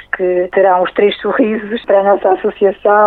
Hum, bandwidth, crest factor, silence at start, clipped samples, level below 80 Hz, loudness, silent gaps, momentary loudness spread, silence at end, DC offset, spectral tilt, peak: none; 4.3 kHz; 12 dB; 0.15 s; under 0.1%; -52 dBFS; -13 LUFS; none; 4 LU; 0 s; under 0.1%; -8.5 dB/octave; 0 dBFS